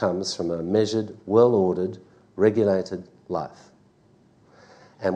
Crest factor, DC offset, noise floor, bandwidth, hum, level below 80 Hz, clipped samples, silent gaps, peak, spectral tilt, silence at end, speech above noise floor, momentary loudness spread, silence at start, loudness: 20 dB; under 0.1%; -58 dBFS; 9.6 kHz; none; -64 dBFS; under 0.1%; none; -6 dBFS; -6 dB/octave; 0 s; 35 dB; 17 LU; 0 s; -23 LUFS